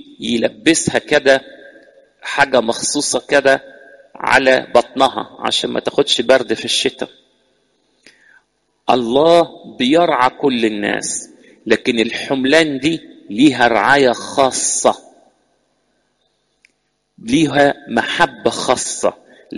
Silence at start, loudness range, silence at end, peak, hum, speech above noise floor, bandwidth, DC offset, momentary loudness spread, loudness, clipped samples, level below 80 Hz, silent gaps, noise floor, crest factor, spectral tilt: 0.2 s; 4 LU; 0 s; 0 dBFS; none; 52 dB; 11.5 kHz; under 0.1%; 10 LU; -15 LUFS; under 0.1%; -52 dBFS; none; -66 dBFS; 16 dB; -3 dB/octave